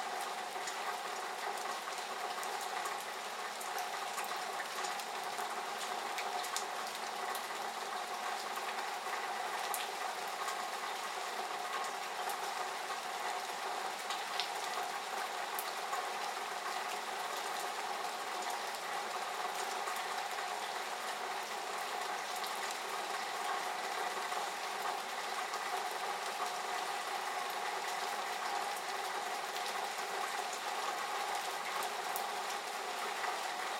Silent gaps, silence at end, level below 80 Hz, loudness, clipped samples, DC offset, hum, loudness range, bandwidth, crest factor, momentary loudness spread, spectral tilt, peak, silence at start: none; 0 s; under -90 dBFS; -39 LUFS; under 0.1%; under 0.1%; none; 1 LU; 16 kHz; 24 dB; 2 LU; 0 dB/octave; -16 dBFS; 0 s